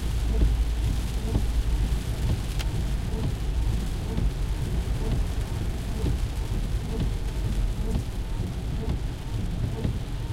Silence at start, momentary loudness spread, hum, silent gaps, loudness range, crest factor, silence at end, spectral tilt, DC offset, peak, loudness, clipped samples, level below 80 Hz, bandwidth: 0 s; 4 LU; none; none; 2 LU; 16 dB; 0 s; -6.5 dB/octave; under 0.1%; -10 dBFS; -29 LUFS; under 0.1%; -28 dBFS; 15.5 kHz